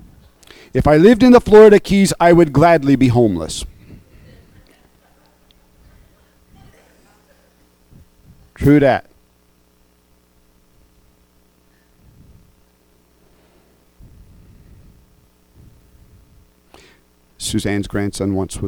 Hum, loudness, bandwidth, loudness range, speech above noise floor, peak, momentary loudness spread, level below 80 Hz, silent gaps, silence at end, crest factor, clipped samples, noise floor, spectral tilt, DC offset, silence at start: 60 Hz at -50 dBFS; -13 LUFS; 19 kHz; 17 LU; 44 dB; 0 dBFS; 16 LU; -40 dBFS; none; 0 s; 18 dB; under 0.1%; -56 dBFS; -6.5 dB/octave; under 0.1%; 0.75 s